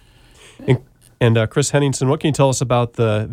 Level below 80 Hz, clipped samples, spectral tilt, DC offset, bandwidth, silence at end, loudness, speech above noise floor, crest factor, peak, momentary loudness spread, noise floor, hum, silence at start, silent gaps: -48 dBFS; under 0.1%; -5.5 dB/octave; under 0.1%; 14.5 kHz; 0 s; -18 LUFS; 30 dB; 16 dB; -2 dBFS; 4 LU; -47 dBFS; none; 0.6 s; none